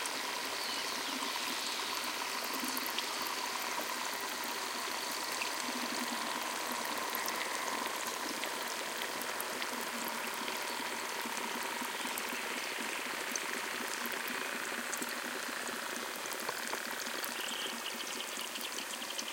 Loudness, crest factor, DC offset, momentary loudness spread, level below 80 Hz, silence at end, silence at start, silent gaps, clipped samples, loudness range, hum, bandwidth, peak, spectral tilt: -36 LUFS; 24 dB; under 0.1%; 3 LU; -80 dBFS; 0 s; 0 s; none; under 0.1%; 2 LU; none; 17 kHz; -14 dBFS; 0 dB/octave